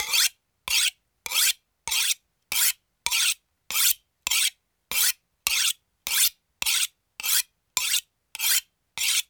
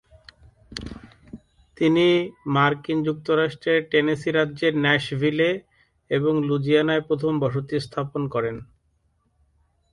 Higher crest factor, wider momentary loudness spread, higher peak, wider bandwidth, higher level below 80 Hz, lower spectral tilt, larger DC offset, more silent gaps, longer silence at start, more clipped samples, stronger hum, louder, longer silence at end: first, 26 dB vs 18 dB; second, 9 LU vs 12 LU; first, -2 dBFS vs -6 dBFS; first, over 20 kHz vs 11.5 kHz; second, -64 dBFS vs -54 dBFS; second, 4 dB/octave vs -7 dB/octave; neither; neither; second, 0 s vs 0.7 s; neither; neither; about the same, -23 LUFS vs -22 LUFS; second, 0.05 s vs 1.3 s